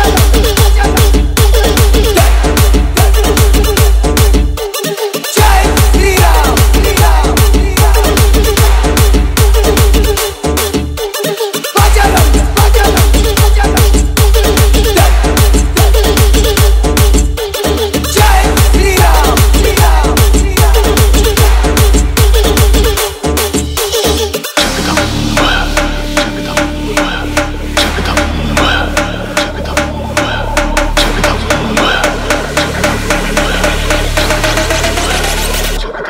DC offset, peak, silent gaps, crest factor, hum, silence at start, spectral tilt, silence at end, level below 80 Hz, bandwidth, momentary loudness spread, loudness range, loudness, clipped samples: under 0.1%; 0 dBFS; none; 8 dB; none; 0 s; -4 dB/octave; 0 s; -10 dBFS; 16.5 kHz; 6 LU; 4 LU; -10 LUFS; 0.2%